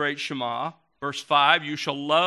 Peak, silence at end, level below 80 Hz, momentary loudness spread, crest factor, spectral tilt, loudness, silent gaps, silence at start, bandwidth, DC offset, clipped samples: -4 dBFS; 0 s; -74 dBFS; 14 LU; 22 dB; -3.5 dB/octave; -24 LUFS; none; 0 s; 13 kHz; under 0.1%; under 0.1%